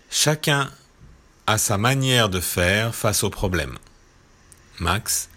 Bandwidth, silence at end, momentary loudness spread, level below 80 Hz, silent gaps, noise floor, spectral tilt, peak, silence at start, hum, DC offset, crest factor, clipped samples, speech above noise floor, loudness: 16.5 kHz; 0.1 s; 10 LU; -42 dBFS; none; -53 dBFS; -3.5 dB/octave; -4 dBFS; 0.1 s; none; under 0.1%; 20 dB; under 0.1%; 32 dB; -21 LUFS